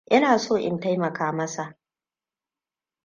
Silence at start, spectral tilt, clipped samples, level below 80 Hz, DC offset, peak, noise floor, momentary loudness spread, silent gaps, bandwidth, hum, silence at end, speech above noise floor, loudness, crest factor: 0.1 s; -5 dB/octave; under 0.1%; -68 dBFS; under 0.1%; -6 dBFS; under -90 dBFS; 13 LU; none; 10 kHz; none; 1.35 s; over 67 dB; -24 LUFS; 20 dB